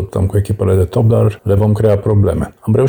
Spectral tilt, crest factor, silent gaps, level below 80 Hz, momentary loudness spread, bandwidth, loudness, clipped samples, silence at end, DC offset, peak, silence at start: -9 dB/octave; 10 dB; none; -32 dBFS; 4 LU; 19 kHz; -14 LUFS; under 0.1%; 0 s; under 0.1%; -2 dBFS; 0 s